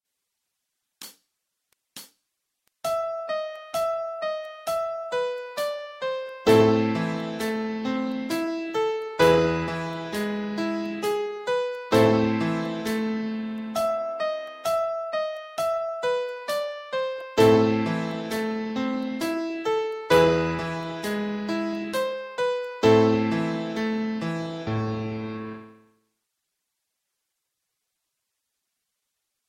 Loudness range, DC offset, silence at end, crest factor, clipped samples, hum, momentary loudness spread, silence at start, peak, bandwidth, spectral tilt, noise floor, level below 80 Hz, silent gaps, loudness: 8 LU; under 0.1%; 3.75 s; 20 dB; under 0.1%; none; 12 LU; 1 s; -6 dBFS; 16 kHz; -6 dB/octave; -81 dBFS; -56 dBFS; none; -26 LUFS